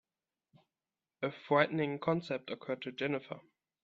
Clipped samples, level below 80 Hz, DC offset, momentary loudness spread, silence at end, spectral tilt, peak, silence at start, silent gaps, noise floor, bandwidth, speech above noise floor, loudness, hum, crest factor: under 0.1%; -78 dBFS; under 0.1%; 11 LU; 0.45 s; -7.5 dB/octave; -14 dBFS; 1.2 s; none; under -90 dBFS; 7.6 kHz; over 55 dB; -35 LUFS; none; 24 dB